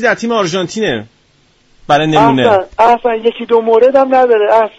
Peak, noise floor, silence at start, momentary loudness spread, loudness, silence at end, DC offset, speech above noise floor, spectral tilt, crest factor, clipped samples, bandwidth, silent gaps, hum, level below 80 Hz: 0 dBFS; -52 dBFS; 0 s; 7 LU; -11 LUFS; 0.1 s; under 0.1%; 42 dB; -5 dB/octave; 12 dB; under 0.1%; 8 kHz; none; none; -46 dBFS